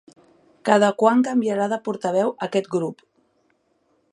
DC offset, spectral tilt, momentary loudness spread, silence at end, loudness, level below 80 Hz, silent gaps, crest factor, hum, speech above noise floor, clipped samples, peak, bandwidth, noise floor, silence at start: under 0.1%; -5.5 dB/octave; 9 LU; 1.2 s; -21 LUFS; -76 dBFS; none; 22 dB; none; 46 dB; under 0.1%; -2 dBFS; 11 kHz; -66 dBFS; 0.65 s